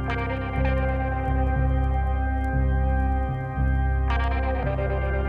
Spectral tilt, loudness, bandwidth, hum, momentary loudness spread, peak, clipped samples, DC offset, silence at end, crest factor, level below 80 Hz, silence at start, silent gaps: -9 dB/octave; -25 LUFS; 4.4 kHz; none; 3 LU; -12 dBFS; under 0.1%; under 0.1%; 0 s; 12 dB; -26 dBFS; 0 s; none